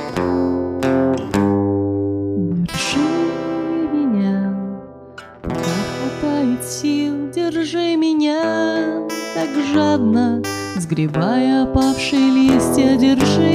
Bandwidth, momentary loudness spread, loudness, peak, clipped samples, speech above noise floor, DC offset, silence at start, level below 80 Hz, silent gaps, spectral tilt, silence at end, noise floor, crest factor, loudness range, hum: 15.5 kHz; 9 LU; -18 LUFS; -2 dBFS; under 0.1%; 23 dB; under 0.1%; 0 s; -42 dBFS; none; -5.5 dB/octave; 0 s; -38 dBFS; 14 dB; 5 LU; none